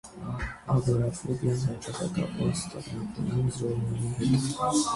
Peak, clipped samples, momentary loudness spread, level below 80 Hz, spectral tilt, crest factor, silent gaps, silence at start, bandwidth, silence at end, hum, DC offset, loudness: -12 dBFS; under 0.1%; 9 LU; -48 dBFS; -6 dB/octave; 16 dB; none; 0.05 s; 11.5 kHz; 0 s; none; under 0.1%; -29 LUFS